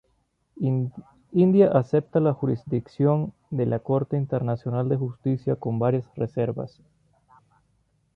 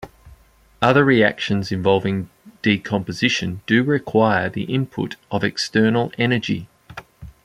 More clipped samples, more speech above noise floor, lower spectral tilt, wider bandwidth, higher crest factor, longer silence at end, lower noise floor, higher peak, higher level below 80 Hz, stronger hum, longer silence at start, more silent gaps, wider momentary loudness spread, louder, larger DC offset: neither; first, 46 dB vs 32 dB; first, -11 dB/octave vs -6 dB/octave; second, 5.6 kHz vs 13.5 kHz; about the same, 18 dB vs 18 dB; first, 1.45 s vs 0.15 s; first, -70 dBFS vs -51 dBFS; second, -6 dBFS vs -2 dBFS; second, -60 dBFS vs -52 dBFS; neither; first, 0.55 s vs 0 s; neither; about the same, 10 LU vs 12 LU; second, -25 LUFS vs -19 LUFS; neither